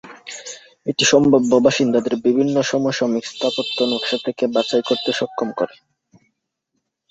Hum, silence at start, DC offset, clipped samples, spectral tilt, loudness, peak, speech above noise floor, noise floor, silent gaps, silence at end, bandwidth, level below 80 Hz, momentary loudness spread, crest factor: none; 0.05 s; under 0.1%; under 0.1%; -4 dB/octave; -18 LUFS; -2 dBFS; 57 dB; -75 dBFS; none; 1.45 s; 8 kHz; -58 dBFS; 14 LU; 18 dB